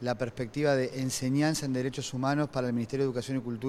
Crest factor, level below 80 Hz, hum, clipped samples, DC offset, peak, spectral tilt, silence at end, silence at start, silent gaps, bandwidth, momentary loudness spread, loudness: 16 dB; -60 dBFS; none; under 0.1%; under 0.1%; -14 dBFS; -5.5 dB/octave; 0 s; 0 s; none; 14.5 kHz; 6 LU; -30 LUFS